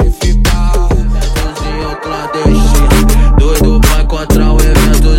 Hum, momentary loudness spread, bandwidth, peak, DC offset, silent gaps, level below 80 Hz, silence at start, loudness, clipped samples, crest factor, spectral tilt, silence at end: none; 9 LU; 16.5 kHz; 0 dBFS; under 0.1%; none; -10 dBFS; 0 s; -11 LUFS; under 0.1%; 8 dB; -5.5 dB/octave; 0 s